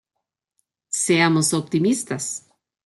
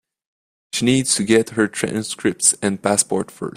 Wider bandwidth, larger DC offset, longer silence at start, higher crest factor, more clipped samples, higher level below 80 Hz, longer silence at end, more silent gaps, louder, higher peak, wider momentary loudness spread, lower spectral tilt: second, 12.5 kHz vs 15.5 kHz; neither; first, 0.9 s vs 0.75 s; about the same, 20 dB vs 20 dB; neither; second, -66 dBFS vs -56 dBFS; first, 0.5 s vs 0.05 s; neither; about the same, -20 LUFS vs -18 LUFS; second, -4 dBFS vs 0 dBFS; first, 11 LU vs 7 LU; about the same, -4 dB/octave vs -3.5 dB/octave